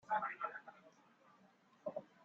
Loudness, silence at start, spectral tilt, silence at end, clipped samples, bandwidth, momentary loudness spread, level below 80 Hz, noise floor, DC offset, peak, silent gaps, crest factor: -45 LUFS; 0.05 s; -2.5 dB/octave; 0.2 s; under 0.1%; 7.6 kHz; 24 LU; under -90 dBFS; -70 dBFS; under 0.1%; -26 dBFS; none; 20 dB